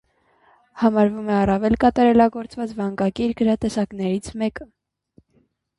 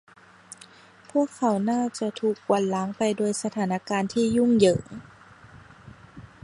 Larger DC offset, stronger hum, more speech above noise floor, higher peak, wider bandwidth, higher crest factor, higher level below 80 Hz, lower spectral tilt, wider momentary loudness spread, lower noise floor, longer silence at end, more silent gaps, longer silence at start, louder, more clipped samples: neither; neither; first, 44 dB vs 27 dB; about the same, -4 dBFS vs -6 dBFS; about the same, 11.5 kHz vs 11.5 kHz; about the same, 18 dB vs 20 dB; first, -46 dBFS vs -60 dBFS; first, -7 dB/octave vs -5.5 dB/octave; second, 11 LU vs 23 LU; first, -64 dBFS vs -51 dBFS; first, 1.15 s vs 0.25 s; neither; second, 0.75 s vs 1.15 s; first, -20 LUFS vs -25 LUFS; neither